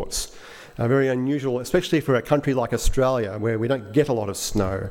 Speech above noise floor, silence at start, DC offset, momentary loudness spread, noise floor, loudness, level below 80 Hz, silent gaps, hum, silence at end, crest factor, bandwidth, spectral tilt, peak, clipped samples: 21 dB; 0 s; under 0.1%; 7 LU; -42 dBFS; -23 LUFS; -34 dBFS; none; none; 0 s; 16 dB; 17 kHz; -5.5 dB/octave; -6 dBFS; under 0.1%